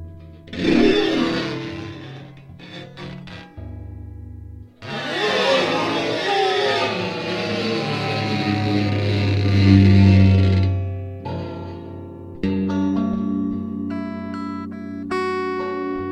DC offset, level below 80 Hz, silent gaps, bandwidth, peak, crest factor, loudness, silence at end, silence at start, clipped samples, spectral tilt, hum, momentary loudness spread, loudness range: under 0.1%; -46 dBFS; none; 9 kHz; 0 dBFS; 20 dB; -20 LUFS; 0 s; 0 s; under 0.1%; -7 dB/octave; none; 22 LU; 11 LU